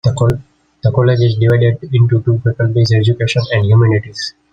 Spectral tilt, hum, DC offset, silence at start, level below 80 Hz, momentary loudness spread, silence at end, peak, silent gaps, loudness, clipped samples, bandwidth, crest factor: -7 dB/octave; none; under 0.1%; 0.05 s; -42 dBFS; 6 LU; 0.2 s; 0 dBFS; none; -13 LUFS; under 0.1%; 7.8 kHz; 12 dB